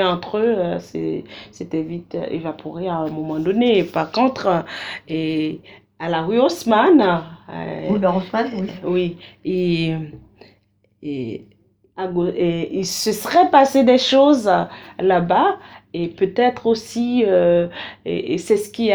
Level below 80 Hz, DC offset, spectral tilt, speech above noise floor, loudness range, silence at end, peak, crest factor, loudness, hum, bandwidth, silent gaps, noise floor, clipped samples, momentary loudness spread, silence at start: -54 dBFS; under 0.1%; -5.5 dB/octave; 42 dB; 9 LU; 0 s; 0 dBFS; 18 dB; -19 LUFS; none; over 20 kHz; none; -60 dBFS; under 0.1%; 16 LU; 0 s